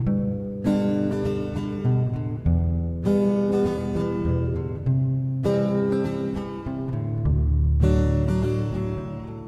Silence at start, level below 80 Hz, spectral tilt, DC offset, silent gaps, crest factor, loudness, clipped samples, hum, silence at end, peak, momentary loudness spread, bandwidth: 0 s; -30 dBFS; -9.5 dB/octave; under 0.1%; none; 14 dB; -24 LUFS; under 0.1%; none; 0 s; -8 dBFS; 7 LU; 9.8 kHz